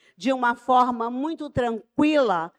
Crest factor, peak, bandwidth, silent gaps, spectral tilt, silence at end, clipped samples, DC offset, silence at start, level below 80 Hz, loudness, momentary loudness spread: 14 dB; -8 dBFS; 10 kHz; none; -6 dB/octave; 0.1 s; under 0.1%; under 0.1%; 0.2 s; -54 dBFS; -23 LUFS; 8 LU